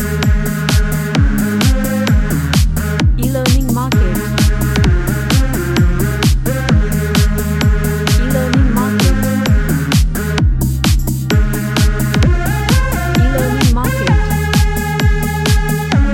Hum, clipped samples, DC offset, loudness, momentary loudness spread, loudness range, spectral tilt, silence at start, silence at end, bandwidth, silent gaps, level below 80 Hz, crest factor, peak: none; under 0.1%; under 0.1%; -14 LUFS; 2 LU; 1 LU; -5.5 dB/octave; 0 s; 0 s; 17 kHz; none; -16 dBFS; 12 dB; 0 dBFS